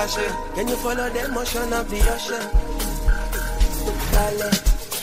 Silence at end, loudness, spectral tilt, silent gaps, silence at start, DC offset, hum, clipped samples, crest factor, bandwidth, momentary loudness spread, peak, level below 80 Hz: 0 s; -24 LUFS; -4 dB/octave; none; 0 s; under 0.1%; none; under 0.1%; 16 dB; 16 kHz; 4 LU; -6 dBFS; -24 dBFS